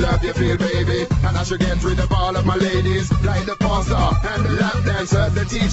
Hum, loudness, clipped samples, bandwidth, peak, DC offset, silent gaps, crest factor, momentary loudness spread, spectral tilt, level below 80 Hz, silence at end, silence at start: none; -19 LUFS; under 0.1%; 8.2 kHz; -4 dBFS; under 0.1%; none; 14 dB; 2 LU; -6 dB/octave; -26 dBFS; 0 s; 0 s